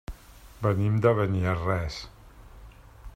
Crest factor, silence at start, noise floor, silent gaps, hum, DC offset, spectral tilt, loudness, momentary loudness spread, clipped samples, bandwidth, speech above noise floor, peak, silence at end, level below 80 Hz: 20 dB; 0.1 s; -48 dBFS; none; none; under 0.1%; -7.5 dB/octave; -26 LUFS; 22 LU; under 0.1%; 13.5 kHz; 23 dB; -8 dBFS; 0 s; -46 dBFS